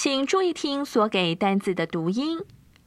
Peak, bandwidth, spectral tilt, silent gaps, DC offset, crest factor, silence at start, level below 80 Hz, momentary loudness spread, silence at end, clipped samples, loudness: -8 dBFS; 14 kHz; -4.5 dB/octave; none; under 0.1%; 16 dB; 0 s; -64 dBFS; 7 LU; 0.4 s; under 0.1%; -25 LUFS